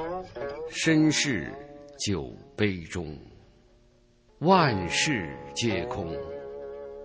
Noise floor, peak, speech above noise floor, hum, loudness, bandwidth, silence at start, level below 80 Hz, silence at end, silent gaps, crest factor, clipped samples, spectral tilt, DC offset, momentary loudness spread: -61 dBFS; -8 dBFS; 34 dB; none; -27 LUFS; 8 kHz; 0 s; -50 dBFS; 0 s; none; 22 dB; under 0.1%; -4.5 dB/octave; under 0.1%; 18 LU